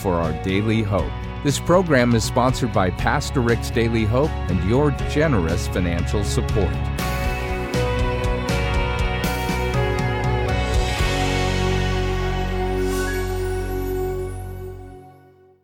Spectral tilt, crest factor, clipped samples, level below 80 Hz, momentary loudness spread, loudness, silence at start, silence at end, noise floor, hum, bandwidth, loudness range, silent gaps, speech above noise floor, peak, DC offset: -6 dB/octave; 16 dB; under 0.1%; -28 dBFS; 7 LU; -21 LUFS; 0 s; 0.5 s; -50 dBFS; none; 17 kHz; 4 LU; none; 31 dB; -4 dBFS; under 0.1%